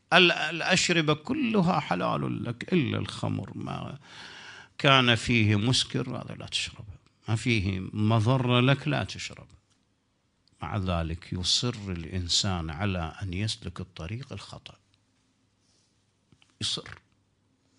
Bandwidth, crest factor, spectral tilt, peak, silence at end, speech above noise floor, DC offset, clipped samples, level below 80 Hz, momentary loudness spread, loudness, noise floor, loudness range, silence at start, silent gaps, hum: 10.5 kHz; 26 dB; -4.5 dB/octave; -2 dBFS; 0.85 s; 44 dB; under 0.1%; under 0.1%; -52 dBFS; 19 LU; -27 LUFS; -72 dBFS; 13 LU; 0.1 s; none; none